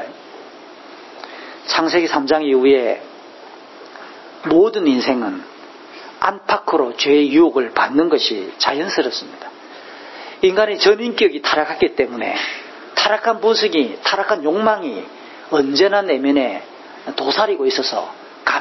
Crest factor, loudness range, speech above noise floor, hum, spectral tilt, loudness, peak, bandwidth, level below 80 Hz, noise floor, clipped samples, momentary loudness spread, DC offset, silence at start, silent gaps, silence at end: 18 dB; 2 LU; 22 dB; none; -3.5 dB/octave; -17 LUFS; 0 dBFS; 6.2 kHz; -60 dBFS; -39 dBFS; under 0.1%; 22 LU; under 0.1%; 0 s; none; 0 s